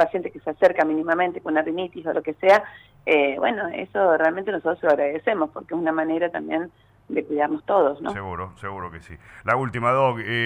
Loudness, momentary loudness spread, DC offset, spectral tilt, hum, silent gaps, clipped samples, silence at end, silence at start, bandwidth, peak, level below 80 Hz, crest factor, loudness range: -23 LUFS; 13 LU; under 0.1%; -7 dB/octave; none; none; under 0.1%; 0 s; 0 s; 9.8 kHz; -6 dBFS; -58 dBFS; 16 dB; 4 LU